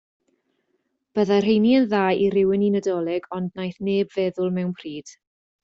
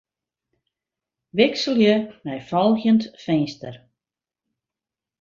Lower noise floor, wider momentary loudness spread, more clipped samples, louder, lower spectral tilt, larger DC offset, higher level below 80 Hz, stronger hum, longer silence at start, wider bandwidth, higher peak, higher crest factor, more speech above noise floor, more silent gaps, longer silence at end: second, -72 dBFS vs -89 dBFS; about the same, 12 LU vs 14 LU; neither; about the same, -22 LUFS vs -21 LUFS; about the same, -7 dB/octave vs -6 dB/octave; neither; about the same, -62 dBFS vs -64 dBFS; neither; second, 1.15 s vs 1.35 s; about the same, 7.6 kHz vs 7.4 kHz; second, -8 dBFS vs -2 dBFS; second, 14 dB vs 20 dB; second, 51 dB vs 69 dB; neither; second, 0.55 s vs 1.45 s